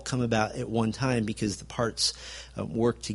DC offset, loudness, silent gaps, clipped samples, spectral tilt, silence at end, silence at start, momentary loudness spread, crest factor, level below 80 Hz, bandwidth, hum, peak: under 0.1%; -29 LUFS; none; under 0.1%; -4.5 dB/octave; 0 s; 0 s; 9 LU; 20 dB; -50 dBFS; 11.5 kHz; none; -10 dBFS